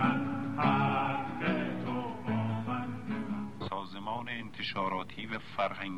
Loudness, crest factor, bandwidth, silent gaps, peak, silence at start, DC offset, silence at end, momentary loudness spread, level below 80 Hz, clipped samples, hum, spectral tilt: -34 LUFS; 20 dB; 11.5 kHz; none; -14 dBFS; 0 s; 0.4%; 0 s; 9 LU; -66 dBFS; under 0.1%; none; -7.5 dB/octave